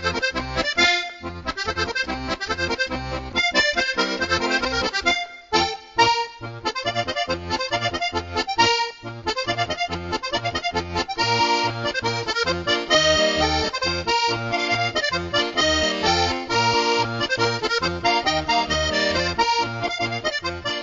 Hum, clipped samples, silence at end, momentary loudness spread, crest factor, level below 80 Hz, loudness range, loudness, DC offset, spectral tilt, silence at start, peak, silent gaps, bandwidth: none; under 0.1%; 0 s; 7 LU; 20 dB; -42 dBFS; 3 LU; -21 LUFS; under 0.1%; -3 dB/octave; 0 s; -4 dBFS; none; 8 kHz